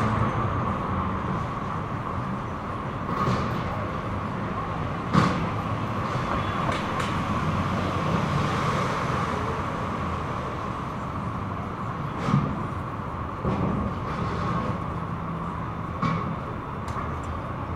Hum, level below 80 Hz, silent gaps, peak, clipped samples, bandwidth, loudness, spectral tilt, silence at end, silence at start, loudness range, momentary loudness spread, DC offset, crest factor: none; -42 dBFS; none; -4 dBFS; under 0.1%; 13.5 kHz; -28 LUFS; -7 dB/octave; 0 s; 0 s; 3 LU; 7 LU; under 0.1%; 22 dB